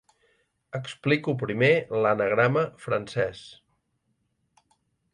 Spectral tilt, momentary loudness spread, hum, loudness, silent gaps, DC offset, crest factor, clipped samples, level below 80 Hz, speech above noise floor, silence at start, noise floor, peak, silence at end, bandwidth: -6.5 dB/octave; 14 LU; none; -25 LUFS; none; under 0.1%; 18 dB; under 0.1%; -64 dBFS; 49 dB; 0.75 s; -74 dBFS; -8 dBFS; 1.6 s; 11 kHz